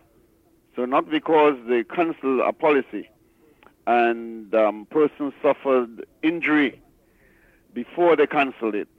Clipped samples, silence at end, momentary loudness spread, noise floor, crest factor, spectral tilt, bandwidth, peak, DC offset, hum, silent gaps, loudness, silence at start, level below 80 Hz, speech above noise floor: under 0.1%; 0.15 s; 14 LU; -60 dBFS; 16 dB; -7 dB/octave; 5.2 kHz; -8 dBFS; under 0.1%; none; none; -22 LUFS; 0.75 s; -68 dBFS; 38 dB